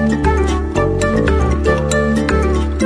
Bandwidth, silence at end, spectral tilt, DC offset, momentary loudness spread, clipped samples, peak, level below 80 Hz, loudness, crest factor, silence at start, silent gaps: 11 kHz; 0 s; -6.5 dB/octave; under 0.1%; 2 LU; under 0.1%; 0 dBFS; -20 dBFS; -15 LUFS; 14 dB; 0 s; none